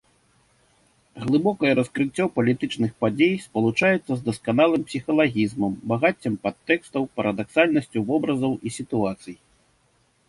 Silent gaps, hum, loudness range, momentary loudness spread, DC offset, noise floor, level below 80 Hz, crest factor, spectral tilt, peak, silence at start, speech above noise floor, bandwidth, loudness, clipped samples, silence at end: none; none; 2 LU; 7 LU; under 0.1%; -64 dBFS; -58 dBFS; 20 dB; -6.5 dB/octave; -4 dBFS; 1.15 s; 42 dB; 11.5 kHz; -23 LUFS; under 0.1%; 0.95 s